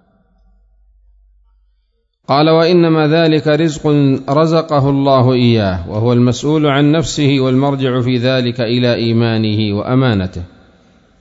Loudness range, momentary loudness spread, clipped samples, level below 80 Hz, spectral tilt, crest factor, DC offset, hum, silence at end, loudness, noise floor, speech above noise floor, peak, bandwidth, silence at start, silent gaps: 3 LU; 5 LU; under 0.1%; -44 dBFS; -7 dB/octave; 12 dB; under 0.1%; none; 0.75 s; -13 LUFS; -62 dBFS; 49 dB; 0 dBFS; 8 kHz; 2.3 s; none